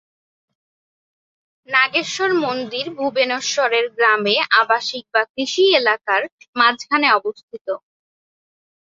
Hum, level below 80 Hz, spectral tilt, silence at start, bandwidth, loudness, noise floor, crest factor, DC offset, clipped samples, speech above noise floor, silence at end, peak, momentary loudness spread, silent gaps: none; -72 dBFS; -2 dB/octave; 1.7 s; 7.8 kHz; -17 LUFS; under -90 dBFS; 18 dB; under 0.1%; under 0.1%; over 72 dB; 1.05 s; -2 dBFS; 12 LU; 5.30-5.34 s, 6.32-6.38 s, 6.48-6.53 s, 7.43-7.48 s, 7.61-7.65 s